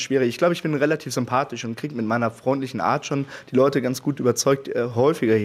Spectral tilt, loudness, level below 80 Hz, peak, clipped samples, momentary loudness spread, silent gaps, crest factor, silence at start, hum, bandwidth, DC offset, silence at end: -5.5 dB/octave; -22 LUFS; -66 dBFS; -6 dBFS; under 0.1%; 8 LU; none; 16 dB; 0 s; none; 15.5 kHz; under 0.1%; 0 s